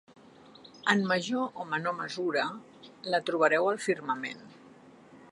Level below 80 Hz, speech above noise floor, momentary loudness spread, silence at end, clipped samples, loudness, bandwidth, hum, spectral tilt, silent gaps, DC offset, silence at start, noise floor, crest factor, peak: -80 dBFS; 25 dB; 11 LU; 0.05 s; under 0.1%; -30 LUFS; 11.5 kHz; none; -4.5 dB/octave; none; under 0.1%; 0.65 s; -54 dBFS; 22 dB; -8 dBFS